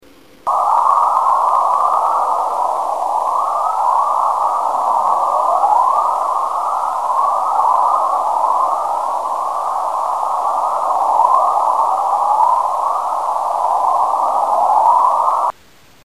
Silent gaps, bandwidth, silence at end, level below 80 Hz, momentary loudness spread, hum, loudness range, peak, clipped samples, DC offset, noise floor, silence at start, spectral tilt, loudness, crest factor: none; 15.5 kHz; 0.55 s; -62 dBFS; 6 LU; none; 1 LU; 0 dBFS; under 0.1%; 0.7%; -48 dBFS; 0.45 s; -2.5 dB/octave; -15 LUFS; 16 dB